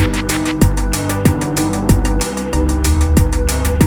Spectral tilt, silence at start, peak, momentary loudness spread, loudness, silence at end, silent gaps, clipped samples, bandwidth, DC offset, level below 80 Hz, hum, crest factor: -5.5 dB/octave; 0 s; 0 dBFS; 4 LU; -16 LUFS; 0 s; none; under 0.1%; over 20 kHz; under 0.1%; -18 dBFS; none; 14 dB